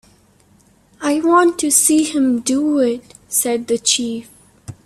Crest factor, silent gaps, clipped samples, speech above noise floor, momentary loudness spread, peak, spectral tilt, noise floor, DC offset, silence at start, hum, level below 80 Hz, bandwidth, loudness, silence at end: 18 dB; none; under 0.1%; 37 dB; 10 LU; 0 dBFS; -2 dB/octave; -53 dBFS; under 0.1%; 1 s; none; -58 dBFS; 16 kHz; -16 LUFS; 0.1 s